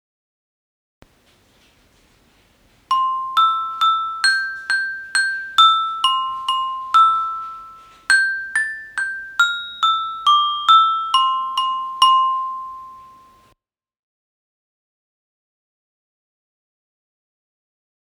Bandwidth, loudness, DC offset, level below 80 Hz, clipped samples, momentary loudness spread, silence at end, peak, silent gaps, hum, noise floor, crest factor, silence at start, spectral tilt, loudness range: 14.5 kHz; -17 LUFS; under 0.1%; -66 dBFS; under 0.1%; 12 LU; 5 s; 0 dBFS; none; none; -65 dBFS; 20 dB; 2.9 s; 3 dB/octave; 7 LU